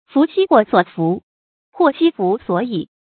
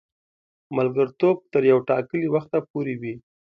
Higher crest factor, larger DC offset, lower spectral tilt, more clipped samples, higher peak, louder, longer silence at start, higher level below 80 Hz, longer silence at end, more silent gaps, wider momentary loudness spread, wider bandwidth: about the same, 16 dB vs 18 dB; neither; first, -11.5 dB/octave vs -10 dB/octave; neither; first, 0 dBFS vs -6 dBFS; first, -17 LUFS vs -23 LUFS; second, 0.15 s vs 0.7 s; first, -62 dBFS vs -68 dBFS; second, 0.2 s vs 0.4 s; first, 1.23-1.73 s vs 2.70-2.74 s; second, 8 LU vs 12 LU; second, 4.6 kHz vs 5.2 kHz